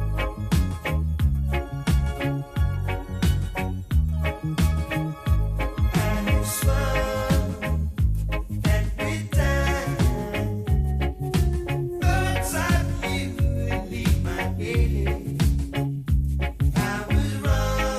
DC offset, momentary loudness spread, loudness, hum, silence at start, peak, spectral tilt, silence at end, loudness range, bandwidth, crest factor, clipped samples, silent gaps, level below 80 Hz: under 0.1%; 4 LU; -25 LUFS; none; 0 s; -8 dBFS; -6 dB/octave; 0 s; 1 LU; 14.5 kHz; 14 dB; under 0.1%; none; -26 dBFS